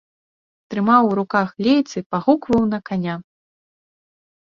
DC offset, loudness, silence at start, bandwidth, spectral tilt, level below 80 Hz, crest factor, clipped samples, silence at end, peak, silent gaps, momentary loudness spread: under 0.1%; -19 LUFS; 0.7 s; 7.4 kHz; -7 dB/octave; -54 dBFS; 18 dB; under 0.1%; 1.3 s; -2 dBFS; 2.06-2.10 s; 10 LU